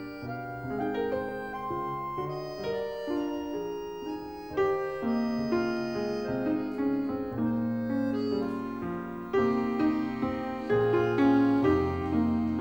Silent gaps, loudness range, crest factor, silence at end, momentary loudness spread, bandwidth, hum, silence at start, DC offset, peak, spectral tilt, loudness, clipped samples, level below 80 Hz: none; 7 LU; 16 dB; 0 s; 10 LU; 16.5 kHz; none; 0 s; under 0.1%; -14 dBFS; -8 dB/octave; -30 LUFS; under 0.1%; -54 dBFS